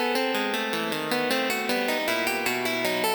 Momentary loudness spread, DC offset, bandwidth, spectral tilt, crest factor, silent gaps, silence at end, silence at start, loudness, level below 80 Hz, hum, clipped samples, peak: 2 LU; under 0.1%; over 20 kHz; -2.5 dB/octave; 18 dB; none; 0 s; 0 s; -25 LUFS; -66 dBFS; none; under 0.1%; -8 dBFS